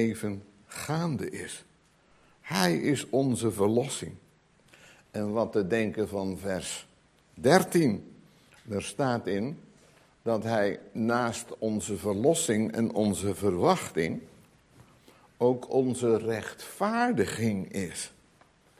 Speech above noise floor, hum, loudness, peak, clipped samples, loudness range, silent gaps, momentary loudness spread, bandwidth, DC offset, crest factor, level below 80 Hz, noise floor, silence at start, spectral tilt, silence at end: 35 dB; none; -29 LUFS; -4 dBFS; under 0.1%; 3 LU; none; 12 LU; 16 kHz; under 0.1%; 26 dB; -58 dBFS; -63 dBFS; 0 s; -5 dB/octave; 0.7 s